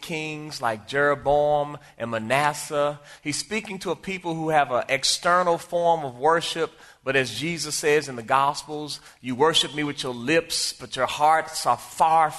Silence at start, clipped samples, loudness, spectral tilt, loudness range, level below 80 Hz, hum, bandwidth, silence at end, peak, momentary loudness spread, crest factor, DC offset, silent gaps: 0 s; under 0.1%; -24 LUFS; -3 dB/octave; 3 LU; -56 dBFS; none; 12.5 kHz; 0 s; -4 dBFS; 11 LU; 20 dB; under 0.1%; none